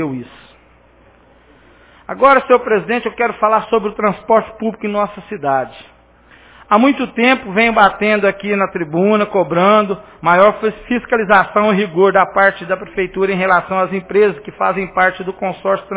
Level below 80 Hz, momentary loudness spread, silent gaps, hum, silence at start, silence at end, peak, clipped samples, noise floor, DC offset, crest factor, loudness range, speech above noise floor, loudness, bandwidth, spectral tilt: -48 dBFS; 10 LU; none; none; 0 s; 0 s; 0 dBFS; under 0.1%; -48 dBFS; under 0.1%; 16 dB; 4 LU; 34 dB; -14 LUFS; 4 kHz; -9.5 dB/octave